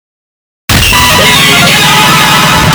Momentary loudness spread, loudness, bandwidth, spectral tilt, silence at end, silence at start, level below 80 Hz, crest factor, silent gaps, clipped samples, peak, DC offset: 4 LU; -3 LUFS; over 20 kHz; -2.5 dB/octave; 0 s; 0.7 s; -24 dBFS; 6 dB; none; 1%; 0 dBFS; under 0.1%